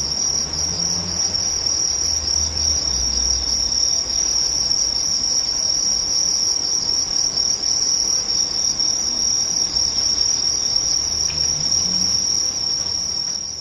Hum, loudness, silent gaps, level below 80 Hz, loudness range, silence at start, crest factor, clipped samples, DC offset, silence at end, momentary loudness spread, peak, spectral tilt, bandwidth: none; -17 LUFS; none; -40 dBFS; 1 LU; 0 s; 14 dB; under 0.1%; under 0.1%; 0 s; 3 LU; -6 dBFS; 0 dB/octave; 12.5 kHz